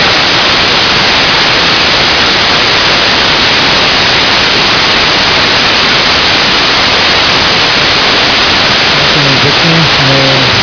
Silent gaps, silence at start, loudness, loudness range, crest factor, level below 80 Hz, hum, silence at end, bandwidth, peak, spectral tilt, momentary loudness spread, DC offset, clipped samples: none; 0 s; -5 LUFS; 0 LU; 8 dB; -30 dBFS; none; 0 s; 5.4 kHz; 0 dBFS; -3 dB/octave; 0 LU; 0.1%; 3%